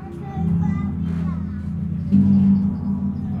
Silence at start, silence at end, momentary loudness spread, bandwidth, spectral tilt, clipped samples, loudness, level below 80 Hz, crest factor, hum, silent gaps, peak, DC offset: 0 s; 0 s; 11 LU; 3.7 kHz; -11 dB/octave; under 0.1%; -21 LUFS; -42 dBFS; 14 dB; none; none; -6 dBFS; under 0.1%